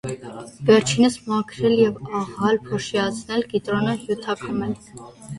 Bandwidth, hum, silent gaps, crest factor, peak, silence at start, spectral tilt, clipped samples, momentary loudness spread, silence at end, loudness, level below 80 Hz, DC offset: 11.5 kHz; none; none; 20 dB; -2 dBFS; 0.05 s; -5 dB/octave; under 0.1%; 15 LU; 0 s; -22 LUFS; -54 dBFS; under 0.1%